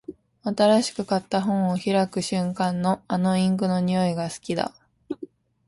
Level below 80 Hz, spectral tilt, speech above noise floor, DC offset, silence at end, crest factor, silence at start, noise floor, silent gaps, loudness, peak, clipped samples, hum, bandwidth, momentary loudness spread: -62 dBFS; -6 dB/octave; 21 dB; under 0.1%; 0.4 s; 16 dB; 0.1 s; -44 dBFS; none; -24 LUFS; -8 dBFS; under 0.1%; none; 11.5 kHz; 15 LU